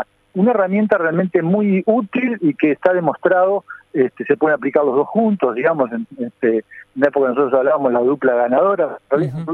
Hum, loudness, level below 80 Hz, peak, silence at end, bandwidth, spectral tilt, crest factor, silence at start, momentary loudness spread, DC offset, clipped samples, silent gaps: none; -17 LUFS; -64 dBFS; -2 dBFS; 0 s; 4.4 kHz; -10 dB/octave; 16 dB; 0 s; 5 LU; under 0.1%; under 0.1%; none